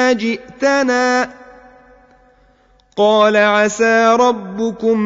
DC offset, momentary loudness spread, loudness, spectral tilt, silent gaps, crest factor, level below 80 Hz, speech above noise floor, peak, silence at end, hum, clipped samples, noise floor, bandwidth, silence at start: under 0.1%; 10 LU; -14 LUFS; -4 dB/octave; none; 14 dB; -56 dBFS; 39 dB; -2 dBFS; 0 s; none; under 0.1%; -53 dBFS; 7.8 kHz; 0 s